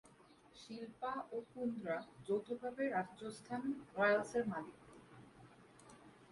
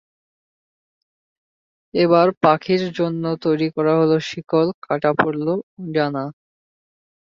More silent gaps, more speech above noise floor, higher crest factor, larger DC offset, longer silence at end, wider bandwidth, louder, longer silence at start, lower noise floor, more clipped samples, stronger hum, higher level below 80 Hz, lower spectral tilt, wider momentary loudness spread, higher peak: second, none vs 2.37-2.41 s, 4.74-4.82 s, 5.63-5.77 s; second, 25 dB vs over 71 dB; about the same, 20 dB vs 20 dB; neither; second, 0.05 s vs 0.9 s; first, 11.5 kHz vs 7.4 kHz; second, -41 LUFS vs -19 LUFS; second, 0.05 s vs 1.95 s; second, -65 dBFS vs under -90 dBFS; neither; neither; second, -78 dBFS vs -62 dBFS; second, -5.5 dB/octave vs -7 dB/octave; first, 25 LU vs 9 LU; second, -22 dBFS vs -2 dBFS